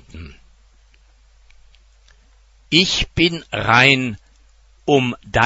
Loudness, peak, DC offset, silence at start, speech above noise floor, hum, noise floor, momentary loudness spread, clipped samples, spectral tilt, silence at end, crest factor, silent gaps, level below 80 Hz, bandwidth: -16 LUFS; 0 dBFS; under 0.1%; 0.15 s; 35 dB; none; -52 dBFS; 22 LU; under 0.1%; -4 dB/octave; 0 s; 20 dB; none; -40 dBFS; 11 kHz